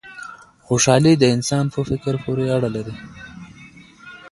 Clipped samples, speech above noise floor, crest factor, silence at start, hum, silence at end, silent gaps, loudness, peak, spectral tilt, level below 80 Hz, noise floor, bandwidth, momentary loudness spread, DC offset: under 0.1%; 26 dB; 20 dB; 0.05 s; none; 0.05 s; none; -18 LUFS; 0 dBFS; -5 dB/octave; -48 dBFS; -44 dBFS; 11.5 kHz; 24 LU; under 0.1%